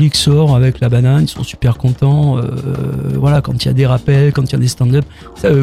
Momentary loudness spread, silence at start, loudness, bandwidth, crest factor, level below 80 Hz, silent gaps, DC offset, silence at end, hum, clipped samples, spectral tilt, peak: 8 LU; 0 s; -13 LUFS; 13 kHz; 12 dB; -34 dBFS; none; under 0.1%; 0 s; none; under 0.1%; -6.5 dB/octave; 0 dBFS